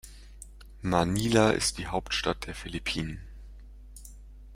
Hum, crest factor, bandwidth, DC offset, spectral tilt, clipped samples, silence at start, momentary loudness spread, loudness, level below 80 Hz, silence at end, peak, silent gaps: none; 24 dB; 16 kHz; under 0.1%; -4.5 dB/octave; under 0.1%; 0.05 s; 25 LU; -28 LUFS; -44 dBFS; 0 s; -8 dBFS; none